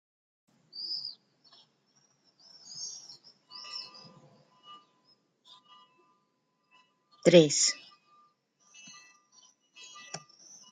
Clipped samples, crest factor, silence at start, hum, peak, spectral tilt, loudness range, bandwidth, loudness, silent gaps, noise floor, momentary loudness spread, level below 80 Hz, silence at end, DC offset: under 0.1%; 28 dB; 0.75 s; none; -6 dBFS; -3.5 dB/octave; 19 LU; 9.6 kHz; -28 LUFS; none; -76 dBFS; 31 LU; -80 dBFS; 0.55 s; under 0.1%